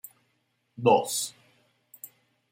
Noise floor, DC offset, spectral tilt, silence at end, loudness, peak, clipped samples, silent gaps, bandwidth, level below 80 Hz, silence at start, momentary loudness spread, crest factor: -74 dBFS; under 0.1%; -4 dB/octave; 0.45 s; -25 LUFS; -8 dBFS; under 0.1%; none; 16.5 kHz; -78 dBFS; 0.8 s; 24 LU; 24 dB